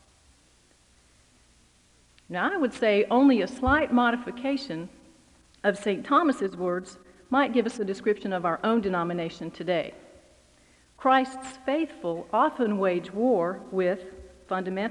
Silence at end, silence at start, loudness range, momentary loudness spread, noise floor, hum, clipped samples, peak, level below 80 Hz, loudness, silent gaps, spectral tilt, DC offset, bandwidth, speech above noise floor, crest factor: 0 s; 2.3 s; 4 LU; 12 LU; -61 dBFS; none; under 0.1%; -10 dBFS; -54 dBFS; -26 LUFS; none; -6 dB/octave; under 0.1%; 11 kHz; 35 dB; 18 dB